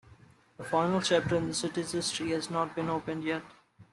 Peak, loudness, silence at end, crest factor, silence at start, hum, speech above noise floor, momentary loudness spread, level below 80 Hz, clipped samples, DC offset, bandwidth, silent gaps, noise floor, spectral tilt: -12 dBFS; -31 LUFS; 0.1 s; 20 dB; 0.1 s; none; 28 dB; 7 LU; -64 dBFS; under 0.1%; under 0.1%; 12.5 kHz; none; -58 dBFS; -4.5 dB/octave